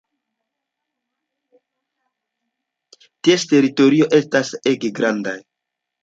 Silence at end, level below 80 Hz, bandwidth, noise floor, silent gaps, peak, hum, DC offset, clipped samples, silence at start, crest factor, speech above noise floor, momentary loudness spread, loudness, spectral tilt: 0.65 s; -68 dBFS; 7.8 kHz; -81 dBFS; none; -2 dBFS; none; under 0.1%; under 0.1%; 3.25 s; 18 dB; 65 dB; 9 LU; -17 LUFS; -5 dB/octave